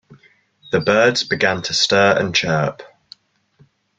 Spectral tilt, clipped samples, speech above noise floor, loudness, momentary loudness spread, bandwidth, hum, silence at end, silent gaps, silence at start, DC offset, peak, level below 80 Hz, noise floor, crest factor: -3.5 dB/octave; under 0.1%; 39 dB; -16 LUFS; 7 LU; 9.4 kHz; none; 1.1 s; none; 0.1 s; under 0.1%; -2 dBFS; -56 dBFS; -56 dBFS; 18 dB